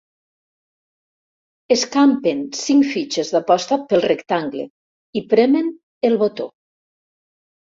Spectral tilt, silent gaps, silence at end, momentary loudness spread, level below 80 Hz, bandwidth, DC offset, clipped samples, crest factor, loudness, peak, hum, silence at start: -4 dB/octave; 4.70-5.13 s, 5.83-6.01 s; 1.15 s; 13 LU; -64 dBFS; 7.8 kHz; under 0.1%; under 0.1%; 18 dB; -18 LUFS; -2 dBFS; none; 1.7 s